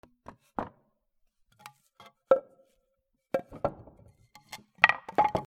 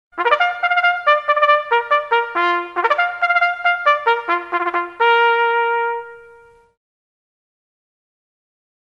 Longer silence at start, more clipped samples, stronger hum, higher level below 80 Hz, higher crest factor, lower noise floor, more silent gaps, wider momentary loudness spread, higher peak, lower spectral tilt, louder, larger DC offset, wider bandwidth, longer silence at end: first, 0.6 s vs 0.15 s; neither; neither; about the same, -62 dBFS vs -66 dBFS; first, 32 dB vs 18 dB; first, -78 dBFS vs -47 dBFS; neither; first, 22 LU vs 6 LU; about the same, 0 dBFS vs 0 dBFS; first, -4.5 dB/octave vs -2.5 dB/octave; second, -29 LUFS vs -16 LUFS; neither; first, 15.5 kHz vs 7.6 kHz; second, 0.05 s vs 2.6 s